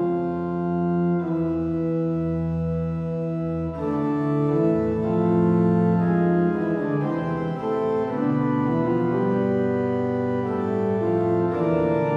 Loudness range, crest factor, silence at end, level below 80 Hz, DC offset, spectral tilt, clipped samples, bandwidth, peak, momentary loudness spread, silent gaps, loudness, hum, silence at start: 3 LU; 14 dB; 0 s; -52 dBFS; under 0.1%; -10.5 dB/octave; under 0.1%; 5.4 kHz; -8 dBFS; 6 LU; none; -23 LUFS; none; 0 s